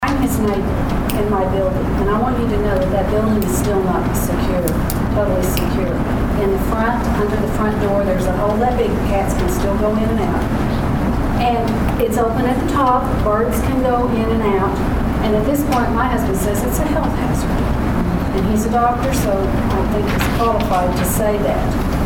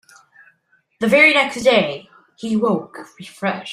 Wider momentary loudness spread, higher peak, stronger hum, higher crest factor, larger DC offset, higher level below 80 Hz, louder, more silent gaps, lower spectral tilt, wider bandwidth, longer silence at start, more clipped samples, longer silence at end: second, 2 LU vs 24 LU; about the same, 0 dBFS vs -2 dBFS; neither; about the same, 16 dB vs 18 dB; neither; first, -24 dBFS vs -62 dBFS; about the same, -17 LUFS vs -16 LUFS; neither; first, -6.5 dB/octave vs -4.5 dB/octave; first, 19 kHz vs 15.5 kHz; second, 0 s vs 1 s; neither; about the same, 0 s vs 0 s